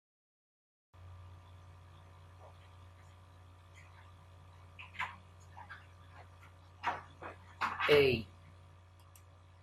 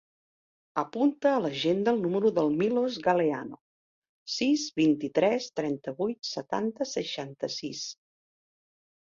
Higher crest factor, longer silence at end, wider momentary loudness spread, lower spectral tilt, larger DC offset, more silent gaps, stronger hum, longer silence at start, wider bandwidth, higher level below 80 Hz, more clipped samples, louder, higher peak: first, 26 dB vs 18 dB; first, 1.35 s vs 1.1 s; first, 26 LU vs 10 LU; about the same, -5.5 dB/octave vs -5 dB/octave; neither; second, none vs 3.61-4.02 s, 4.09-4.26 s; neither; first, 1 s vs 0.75 s; first, 13.5 kHz vs 7.6 kHz; about the same, -70 dBFS vs -72 dBFS; neither; second, -34 LUFS vs -28 LUFS; second, -14 dBFS vs -10 dBFS